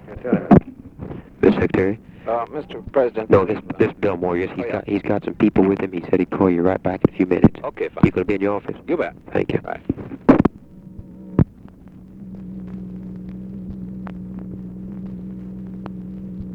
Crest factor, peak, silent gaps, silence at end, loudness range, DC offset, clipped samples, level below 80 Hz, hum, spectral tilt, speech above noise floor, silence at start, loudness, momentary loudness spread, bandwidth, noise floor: 20 dB; 0 dBFS; none; 0 s; 14 LU; under 0.1%; under 0.1%; -42 dBFS; none; -10 dB/octave; 23 dB; 0.05 s; -20 LUFS; 17 LU; 6.8 kHz; -42 dBFS